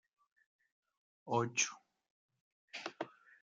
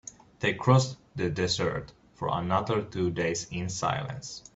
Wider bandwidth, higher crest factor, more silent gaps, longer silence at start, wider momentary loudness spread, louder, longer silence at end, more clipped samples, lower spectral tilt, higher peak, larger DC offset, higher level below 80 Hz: first, 9.6 kHz vs 8 kHz; about the same, 24 dB vs 22 dB; first, 2.10-2.29 s, 2.41-2.68 s vs none; first, 1.25 s vs 0.05 s; first, 15 LU vs 12 LU; second, -39 LUFS vs -29 LUFS; first, 0.35 s vs 0.15 s; neither; second, -2.5 dB/octave vs -5 dB/octave; second, -20 dBFS vs -8 dBFS; neither; second, -86 dBFS vs -56 dBFS